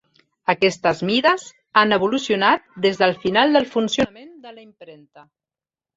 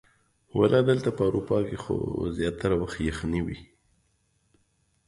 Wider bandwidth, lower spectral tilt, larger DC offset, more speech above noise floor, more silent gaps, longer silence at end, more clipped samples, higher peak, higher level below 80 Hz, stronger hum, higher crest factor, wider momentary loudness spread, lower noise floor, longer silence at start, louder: second, 8 kHz vs 11.5 kHz; second, -4.5 dB/octave vs -7 dB/octave; neither; first, over 71 dB vs 44 dB; neither; second, 1.05 s vs 1.45 s; neither; first, -2 dBFS vs -8 dBFS; second, -58 dBFS vs -46 dBFS; neither; about the same, 18 dB vs 20 dB; second, 6 LU vs 9 LU; first, under -90 dBFS vs -70 dBFS; about the same, 0.5 s vs 0.55 s; first, -19 LUFS vs -27 LUFS